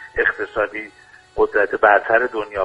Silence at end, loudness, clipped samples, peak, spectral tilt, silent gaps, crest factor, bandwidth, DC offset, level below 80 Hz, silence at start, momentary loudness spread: 0 s; -18 LUFS; under 0.1%; 0 dBFS; -5.5 dB/octave; none; 18 dB; 9 kHz; under 0.1%; -46 dBFS; 0 s; 16 LU